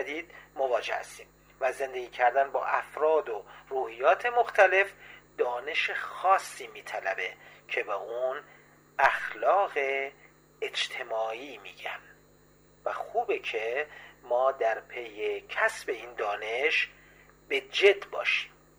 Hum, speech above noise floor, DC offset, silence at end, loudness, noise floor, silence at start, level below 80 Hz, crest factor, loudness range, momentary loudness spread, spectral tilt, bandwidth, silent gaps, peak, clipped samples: 50 Hz at -65 dBFS; 31 dB; under 0.1%; 0.3 s; -29 LUFS; -60 dBFS; 0 s; -68 dBFS; 22 dB; 7 LU; 14 LU; -2 dB/octave; over 20 kHz; none; -8 dBFS; under 0.1%